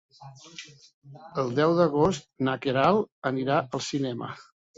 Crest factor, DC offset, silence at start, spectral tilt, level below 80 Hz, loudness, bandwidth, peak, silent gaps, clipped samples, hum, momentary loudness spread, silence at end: 20 dB; under 0.1%; 0.2 s; -6 dB/octave; -60 dBFS; -26 LUFS; 8 kHz; -8 dBFS; 0.94-1.02 s, 3.12-3.22 s; under 0.1%; none; 21 LU; 0.35 s